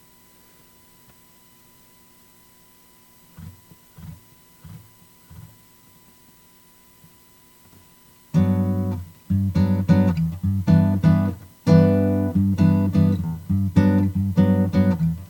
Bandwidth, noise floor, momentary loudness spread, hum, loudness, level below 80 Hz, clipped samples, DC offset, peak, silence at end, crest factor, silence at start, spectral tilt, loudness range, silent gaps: 18 kHz; -53 dBFS; 13 LU; 60 Hz at -55 dBFS; -20 LUFS; -48 dBFS; under 0.1%; under 0.1%; -4 dBFS; 0.05 s; 18 dB; 3.4 s; -9 dB/octave; 9 LU; none